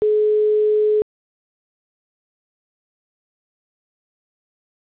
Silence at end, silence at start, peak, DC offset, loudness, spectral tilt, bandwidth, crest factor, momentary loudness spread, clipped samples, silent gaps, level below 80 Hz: 3.95 s; 0 s; -14 dBFS; under 0.1%; -18 LUFS; -9.5 dB/octave; 4 kHz; 10 dB; 5 LU; under 0.1%; none; -64 dBFS